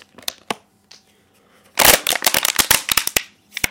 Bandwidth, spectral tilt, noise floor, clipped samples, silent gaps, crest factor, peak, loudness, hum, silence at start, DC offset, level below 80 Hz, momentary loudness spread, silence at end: over 20 kHz; 0 dB/octave; -56 dBFS; under 0.1%; none; 20 dB; 0 dBFS; -15 LUFS; none; 0.3 s; under 0.1%; -44 dBFS; 18 LU; 0 s